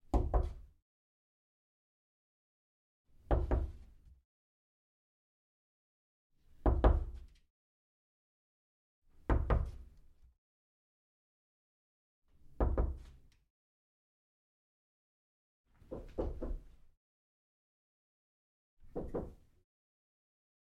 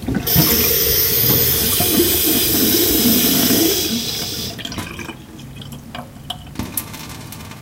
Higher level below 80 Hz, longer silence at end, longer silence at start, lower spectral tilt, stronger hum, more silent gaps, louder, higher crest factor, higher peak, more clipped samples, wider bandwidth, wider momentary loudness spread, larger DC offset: second, -42 dBFS vs -36 dBFS; first, 1.3 s vs 0 s; first, 0.15 s vs 0 s; first, -9.5 dB/octave vs -3 dB/octave; neither; first, 0.82-3.05 s, 4.25-6.30 s, 7.50-9.02 s, 10.38-12.22 s, 13.50-15.64 s, 16.97-18.77 s vs none; second, -38 LUFS vs -14 LUFS; first, 26 dB vs 18 dB; second, -14 dBFS vs 0 dBFS; neither; second, 4.2 kHz vs 17 kHz; about the same, 19 LU vs 20 LU; neither